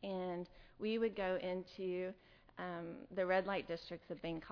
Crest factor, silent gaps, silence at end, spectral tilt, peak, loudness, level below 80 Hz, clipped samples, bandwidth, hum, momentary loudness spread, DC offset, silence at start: 18 dB; none; 0 s; -4 dB/octave; -24 dBFS; -42 LUFS; -68 dBFS; under 0.1%; 5.4 kHz; none; 12 LU; under 0.1%; 0 s